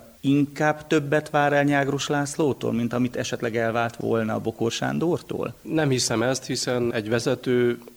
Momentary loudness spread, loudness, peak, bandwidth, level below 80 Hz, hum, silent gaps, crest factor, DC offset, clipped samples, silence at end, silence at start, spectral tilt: 5 LU; -24 LUFS; -6 dBFS; over 20 kHz; -58 dBFS; none; none; 18 dB; under 0.1%; under 0.1%; 0.1 s; 0 s; -5 dB/octave